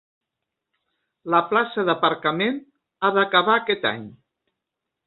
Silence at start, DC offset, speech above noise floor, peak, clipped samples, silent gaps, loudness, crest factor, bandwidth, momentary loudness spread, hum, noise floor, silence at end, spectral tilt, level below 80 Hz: 1.25 s; under 0.1%; 62 dB; -2 dBFS; under 0.1%; none; -21 LUFS; 22 dB; 4.4 kHz; 9 LU; none; -83 dBFS; 0.95 s; -9 dB/octave; -70 dBFS